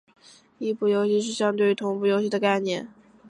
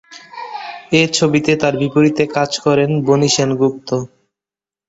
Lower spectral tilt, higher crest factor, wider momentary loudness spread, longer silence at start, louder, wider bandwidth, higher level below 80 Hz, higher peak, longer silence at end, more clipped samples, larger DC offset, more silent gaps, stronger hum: about the same, -5 dB/octave vs -5 dB/octave; about the same, 16 dB vs 16 dB; second, 9 LU vs 16 LU; first, 0.6 s vs 0.1 s; second, -24 LUFS vs -15 LUFS; first, 10.5 kHz vs 8.2 kHz; second, -74 dBFS vs -54 dBFS; second, -8 dBFS vs 0 dBFS; second, 0 s vs 0.8 s; neither; neither; neither; neither